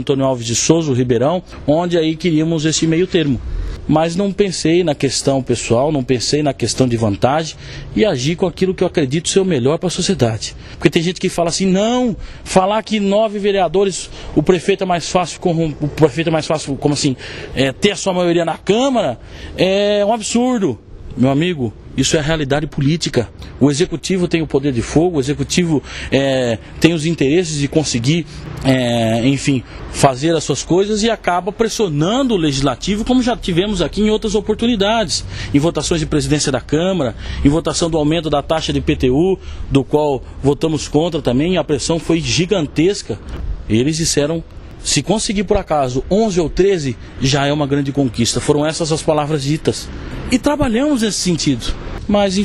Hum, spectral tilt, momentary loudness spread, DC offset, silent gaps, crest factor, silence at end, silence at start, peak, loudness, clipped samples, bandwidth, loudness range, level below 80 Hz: none; -5 dB/octave; 5 LU; under 0.1%; none; 16 dB; 0 s; 0 s; 0 dBFS; -16 LUFS; under 0.1%; 13.5 kHz; 1 LU; -34 dBFS